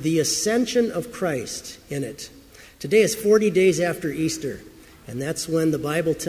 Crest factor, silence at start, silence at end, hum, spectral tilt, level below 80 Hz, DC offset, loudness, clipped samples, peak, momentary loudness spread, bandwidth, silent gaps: 18 dB; 0 s; 0 s; none; -4.5 dB/octave; -54 dBFS; under 0.1%; -22 LUFS; under 0.1%; -4 dBFS; 15 LU; 16 kHz; none